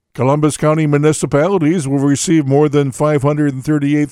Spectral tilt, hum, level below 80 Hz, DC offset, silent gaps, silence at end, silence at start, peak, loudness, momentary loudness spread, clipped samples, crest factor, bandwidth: -6.5 dB/octave; none; -48 dBFS; under 0.1%; none; 0 s; 0.15 s; 0 dBFS; -14 LUFS; 3 LU; under 0.1%; 12 dB; 14 kHz